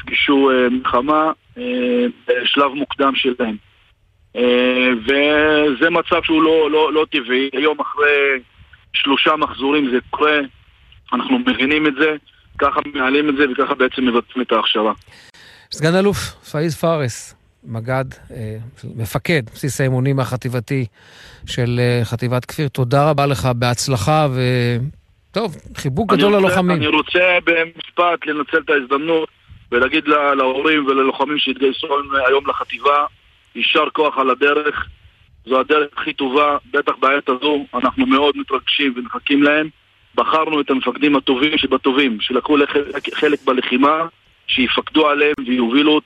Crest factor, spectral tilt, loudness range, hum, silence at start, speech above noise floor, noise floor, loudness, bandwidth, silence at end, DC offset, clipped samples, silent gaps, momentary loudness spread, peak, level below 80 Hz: 16 dB; -5.5 dB/octave; 5 LU; none; 0.05 s; 39 dB; -55 dBFS; -16 LUFS; 13 kHz; 0.05 s; under 0.1%; under 0.1%; none; 10 LU; -2 dBFS; -48 dBFS